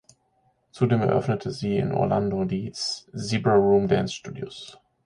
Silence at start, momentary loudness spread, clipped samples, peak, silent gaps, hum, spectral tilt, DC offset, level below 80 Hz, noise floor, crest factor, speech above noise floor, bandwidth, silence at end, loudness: 0.75 s; 16 LU; under 0.1%; -8 dBFS; none; none; -6.5 dB/octave; under 0.1%; -54 dBFS; -67 dBFS; 18 dB; 44 dB; 11 kHz; 0.35 s; -24 LUFS